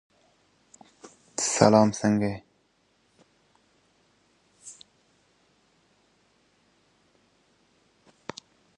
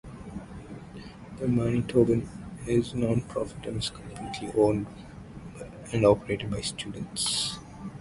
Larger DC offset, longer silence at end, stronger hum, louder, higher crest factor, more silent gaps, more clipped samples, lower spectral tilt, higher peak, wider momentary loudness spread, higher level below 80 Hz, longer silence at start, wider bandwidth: neither; first, 4.05 s vs 0 s; neither; first, -23 LUFS vs -28 LUFS; first, 30 dB vs 22 dB; neither; neither; about the same, -5 dB/octave vs -5.5 dB/octave; first, -2 dBFS vs -6 dBFS; first, 29 LU vs 19 LU; second, -64 dBFS vs -50 dBFS; first, 1.4 s vs 0.05 s; about the same, 11.5 kHz vs 11.5 kHz